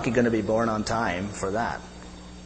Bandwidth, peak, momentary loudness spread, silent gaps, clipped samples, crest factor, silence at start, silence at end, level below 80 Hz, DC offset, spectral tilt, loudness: 8.8 kHz; -8 dBFS; 19 LU; none; under 0.1%; 18 dB; 0 s; 0 s; -46 dBFS; under 0.1%; -5.5 dB/octave; -26 LUFS